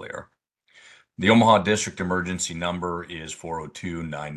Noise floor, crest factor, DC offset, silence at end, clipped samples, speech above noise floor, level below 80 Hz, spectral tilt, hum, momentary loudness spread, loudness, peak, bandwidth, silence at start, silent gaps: -65 dBFS; 22 dB; under 0.1%; 0 s; under 0.1%; 42 dB; -50 dBFS; -4.5 dB/octave; none; 17 LU; -23 LUFS; -4 dBFS; 12 kHz; 0 s; none